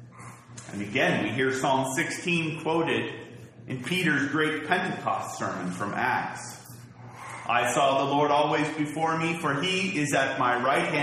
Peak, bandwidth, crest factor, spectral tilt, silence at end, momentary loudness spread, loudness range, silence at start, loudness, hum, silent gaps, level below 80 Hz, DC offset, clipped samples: -6 dBFS; 13 kHz; 20 dB; -4.5 dB/octave; 0 s; 19 LU; 4 LU; 0 s; -26 LUFS; none; none; -66 dBFS; under 0.1%; under 0.1%